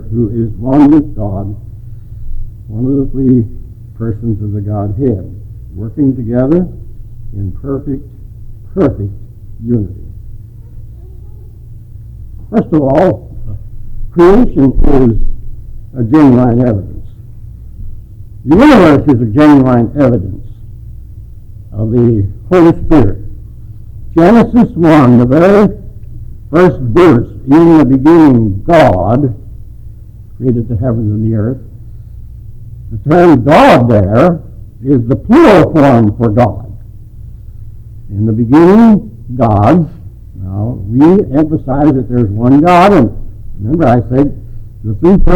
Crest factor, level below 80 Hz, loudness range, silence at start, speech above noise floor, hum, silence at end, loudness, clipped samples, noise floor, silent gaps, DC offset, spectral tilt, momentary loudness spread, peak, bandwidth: 10 dB; -22 dBFS; 10 LU; 0 s; 22 dB; none; 0 s; -9 LUFS; under 0.1%; -30 dBFS; none; under 0.1%; -9 dB/octave; 23 LU; 0 dBFS; 10.5 kHz